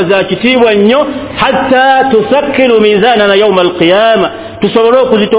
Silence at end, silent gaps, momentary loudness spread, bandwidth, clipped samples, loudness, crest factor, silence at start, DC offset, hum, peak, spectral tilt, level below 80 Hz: 0 s; none; 5 LU; 4 kHz; 2%; -8 LUFS; 8 dB; 0 s; under 0.1%; none; 0 dBFS; -9 dB/octave; -42 dBFS